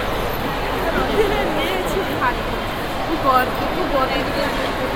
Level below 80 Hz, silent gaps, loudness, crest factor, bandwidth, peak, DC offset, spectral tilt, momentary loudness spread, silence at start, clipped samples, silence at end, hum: -32 dBFS; none; -20 LUFS; 18 dB; 16.5 kHz; -2 dBFS; under 0.1%; -5 dB/octave; 6 LU; 0 s; under 0.1%; 0 s; none